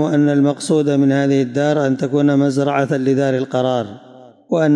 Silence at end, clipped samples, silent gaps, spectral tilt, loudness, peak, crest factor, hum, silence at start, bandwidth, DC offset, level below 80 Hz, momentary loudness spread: 0 s; under 0.1%; none; -7 dB/octave; -16 LUFS; -6 dBFS; 10 dB; none; 0 s; 11 kHz; under 0.1%; -68 dBFS; 4 LU